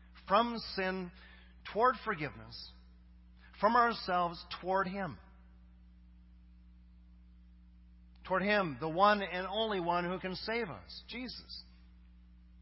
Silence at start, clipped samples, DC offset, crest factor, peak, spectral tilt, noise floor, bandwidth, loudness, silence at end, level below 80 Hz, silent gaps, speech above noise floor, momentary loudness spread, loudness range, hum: 0.1 s; under 0.1%; under 0.1%; 22 dB; -14 dBFS; -8.5 dB/octave; -58 dBFS; 5.8 kHz; -34 LUFS; 0 s; -58 dBFS; none; 24 dB; 19 LU; 8 LU; none